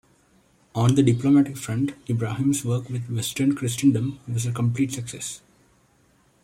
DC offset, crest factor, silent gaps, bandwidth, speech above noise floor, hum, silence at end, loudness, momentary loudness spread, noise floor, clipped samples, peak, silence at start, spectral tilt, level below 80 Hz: under 0.1%; 16 dB; none; 16 kHz; 38 dB; none; 1.05 s; -24 LUFS; 12 LU; -61 dBFS; under 0.1%; -8 dBFS; 0.75 s; -6 dB/octave; -58 dBFS